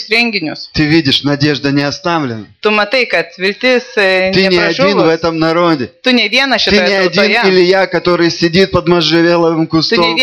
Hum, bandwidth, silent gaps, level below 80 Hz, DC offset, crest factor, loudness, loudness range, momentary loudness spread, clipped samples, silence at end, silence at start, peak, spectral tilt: none; 11.5 kHz; none; -42 dBFS; 0.2%; 10 dB; -11 LUFS; 3 LU; 5 LU; under 0.1%; 0 s; 0 s; 0 dBFS; -5 dB/octave